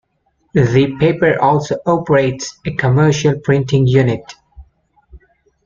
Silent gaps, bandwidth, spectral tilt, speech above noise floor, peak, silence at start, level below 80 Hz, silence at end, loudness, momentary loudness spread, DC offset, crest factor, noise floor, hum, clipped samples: none; 7.4 kHz; -6.5 dB/octave; 49 dB; -2 dBFS; 0.55 s; -44 dBFS; 0.5 s; -14 LUFS; 7 LU; under 0.1%; 14 dB; -63 dBFS; none; under 0.1%